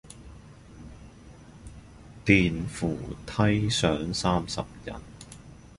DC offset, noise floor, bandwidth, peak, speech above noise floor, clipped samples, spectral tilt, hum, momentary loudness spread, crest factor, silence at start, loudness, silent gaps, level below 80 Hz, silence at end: under 0.1%; -49 dBFS; 11.5 kHz; -4 dBFS; 23 dB; under 0.1%; -5 dB/octave; none; 26 LU; 26 dB; 0.05 s; -26 LUFS; none; -46 dBFS; 0.05 s